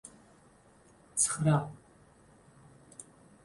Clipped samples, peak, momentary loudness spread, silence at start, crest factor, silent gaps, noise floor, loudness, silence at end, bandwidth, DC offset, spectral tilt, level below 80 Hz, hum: under 0.1%; -14 dBFS; 24 LU; 1.15 s; 22 dB; none; -61 dBFS; -29 LUFS; 0.4 s; 11.5 kHz; under 0.1%; -5 dB/octave; -66 dBFS; none